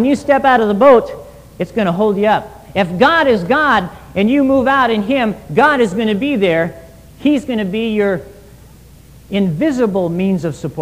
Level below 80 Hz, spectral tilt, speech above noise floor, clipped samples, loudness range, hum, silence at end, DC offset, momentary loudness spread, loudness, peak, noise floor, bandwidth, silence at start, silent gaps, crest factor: -44 dBFS; -6.5 dB/octave; 27 dB; under 0.1%; 5 LU; none; 0 s; 0.2%; 10 LU; -14 LUFS; 0 dBFS; -41 dBFS; 15.5 kHz; 0 s; none; 14 dB